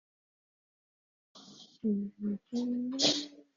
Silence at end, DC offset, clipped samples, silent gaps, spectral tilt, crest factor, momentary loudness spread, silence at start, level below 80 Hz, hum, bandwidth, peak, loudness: 0.15 s; under 0.1%; under 0.1%; none; -3.5 dB/octave; 24 dB; 13 LU; 1.35 s; -78 dBFS; none; 7.4 kHz; -14 dBFS; -33 LUFS